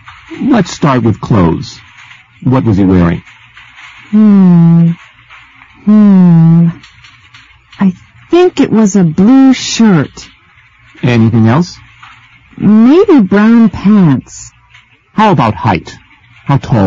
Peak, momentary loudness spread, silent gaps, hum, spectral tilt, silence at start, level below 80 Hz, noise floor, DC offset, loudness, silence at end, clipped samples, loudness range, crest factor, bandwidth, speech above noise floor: 0 dBFS; 13 LU; none; none; -7.5 dB/octave; 0.3 s; -38 dBFS; -43 dBFS; under 0.1%; -8 LUFS; 0 s; 0.1%; 4 LU; 8 dB; 7.6 kHz; 37 dB